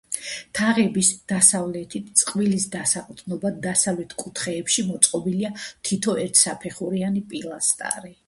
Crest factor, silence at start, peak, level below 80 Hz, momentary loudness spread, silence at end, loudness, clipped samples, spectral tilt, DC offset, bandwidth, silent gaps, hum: 24 dB; 0.1 s; 0 dBFS; -62 dBFS; 12 LU; 0.15 s; -21 LUFS; under 0.1%; -3 dB/octave; under 0.1%; 12 kHz; none; none